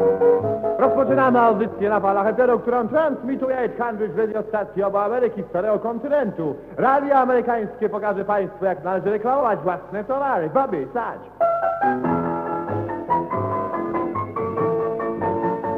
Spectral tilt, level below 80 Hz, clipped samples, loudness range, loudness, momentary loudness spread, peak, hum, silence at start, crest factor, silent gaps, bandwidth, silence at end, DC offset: -9.5 dB/octave; -56 dBFS; under 0.1%; 4 LU; -21 LUFS; 8 LU; -4 dBFS; none; 0 s; 16 dB; none; 4.9 kHz; 0 s; under 0.1%